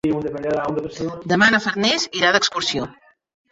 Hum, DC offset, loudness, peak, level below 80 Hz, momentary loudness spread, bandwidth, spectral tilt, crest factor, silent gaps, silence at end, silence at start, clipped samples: none; under 0.1%; -19 LUFS; -2 dBFS; -54 dBFS; 12 LU; 8 kHz; -3.5 dB/octave; 20 dB; none; 0.6 s; 0.05 s; under 0.1%